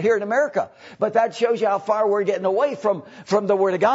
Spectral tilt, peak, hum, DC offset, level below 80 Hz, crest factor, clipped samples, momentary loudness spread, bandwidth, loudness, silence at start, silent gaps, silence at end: -5.5 dB/octave; -6 dBFS; none; under 0.1%; -70 dBFS; 16 dB; under 0.1%; 6 LU; 8 kHz; -21 LUFS; 0 s; none; 0 s